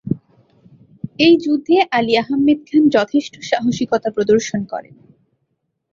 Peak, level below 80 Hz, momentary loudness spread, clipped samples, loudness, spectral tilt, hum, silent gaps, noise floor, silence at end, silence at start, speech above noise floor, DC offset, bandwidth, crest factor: -2 dBFS; -56 dBFS; 13 LU; under 0.1%; -16 LUFS; -5 dB/octave; none; none; -71 dBFS; 1.1 s; 0.05 s; 55 dB; under 0.1%; 7.6 kHz; 16 dB